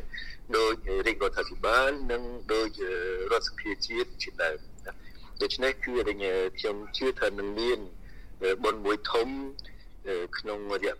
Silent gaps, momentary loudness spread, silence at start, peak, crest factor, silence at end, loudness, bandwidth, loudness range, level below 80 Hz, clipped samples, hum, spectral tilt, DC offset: none; 14 LU; 0 s; -8 dBFS; 22 dB; 0 s; -30 LUFS; 15.5 kHz; 3 LU; -44 dBFS; under 0.1%; none; -3.5 dB/octave; 0.6%